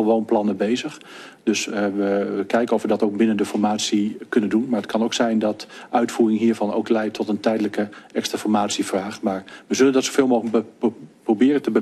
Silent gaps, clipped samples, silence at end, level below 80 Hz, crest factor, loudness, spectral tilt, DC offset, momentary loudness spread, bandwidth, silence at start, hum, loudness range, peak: none; under 0.1%; 0 s; -68 dBFS; 18 dB; -21 LUFS; -4.5 dB/octave; under 0.1%; 8 LU; 13 kHz; 0 s; none; 1 LU; -4 dBFS